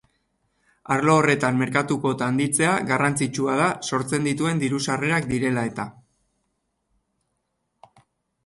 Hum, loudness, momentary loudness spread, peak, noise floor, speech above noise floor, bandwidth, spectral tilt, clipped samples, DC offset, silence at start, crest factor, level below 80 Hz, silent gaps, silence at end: none; -22 LUFS; 7 LU; -6 dBFS; -75 dBFS; 53 dB; 12 kHz; -5 dB/octave; under 0.1%; under 0.1%; 0.9 s; 18 dB; -58 dBFS; none; 2.55 s